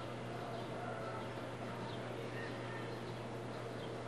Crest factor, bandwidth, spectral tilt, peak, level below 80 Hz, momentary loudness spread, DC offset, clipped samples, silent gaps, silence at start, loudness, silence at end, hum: 12 dB; 13 kHz; -6 dB/octave; -32 dBFS; -68 dBFS; 2 LU; under 0.1%; under 0.1%; none; 0 s; -45 LUFS; 0 s; none